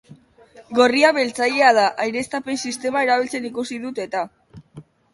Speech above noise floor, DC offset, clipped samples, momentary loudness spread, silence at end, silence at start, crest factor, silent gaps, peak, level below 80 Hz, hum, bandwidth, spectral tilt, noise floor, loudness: 29 dB; under 0.1%; under 0.1%; 13 LU; 0.3 s; 0.1 s; 20 dB; none; -2 dBFS; -64 dBFS; none; 11.5 kHz; -3 dB/octave; -49 dBFS; -19 LUFS